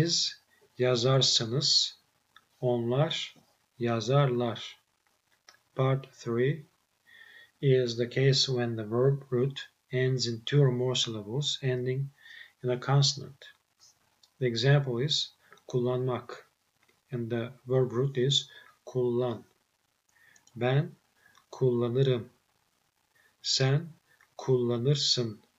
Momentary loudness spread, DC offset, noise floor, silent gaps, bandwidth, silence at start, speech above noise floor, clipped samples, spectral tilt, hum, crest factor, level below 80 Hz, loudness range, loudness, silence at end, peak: 14 LU; under 0.1%; -75 dBFS; none; 8.2 kHz; 0 s; 47 dB; under 0.1%; -5 dB/octave; none; 18 dB; -78 dBFS; 4 LU; -28 LUFS; 0.25 s; -12 dBFS